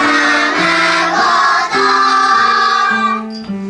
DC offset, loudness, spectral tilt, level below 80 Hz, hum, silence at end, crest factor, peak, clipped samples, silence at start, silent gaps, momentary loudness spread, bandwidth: under 0.1%; -11 LUFS; -2.5 dB/octave; -54 dBFS; none; 0 s; 10 dB; -2 dBFS; under 0.1%; 0 s; none; 4 LU; 11.5 kHz